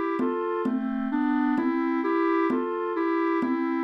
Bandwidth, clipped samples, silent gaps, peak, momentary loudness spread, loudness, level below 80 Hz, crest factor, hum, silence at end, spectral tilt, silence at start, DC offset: 5.6 kHz; under 0.1%; none; -14 dBFS; 4 LU; -26 LUFS; -64 dBFS; 10 dB; none; 0 s; -7.5 dB/octave; 0 s; under 0.1%